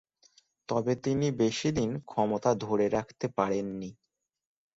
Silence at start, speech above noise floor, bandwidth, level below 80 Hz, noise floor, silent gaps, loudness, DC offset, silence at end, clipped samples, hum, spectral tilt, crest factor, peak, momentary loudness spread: 0.7 s; 36 dB; 8 kHz; -62 dBFS; -65 dBFS; none; -30 LUFS; under 0.1%; 0.85 s; under 0.1%; none; -6 dB/octave; 20 dB; -10 dBFS; 9 LU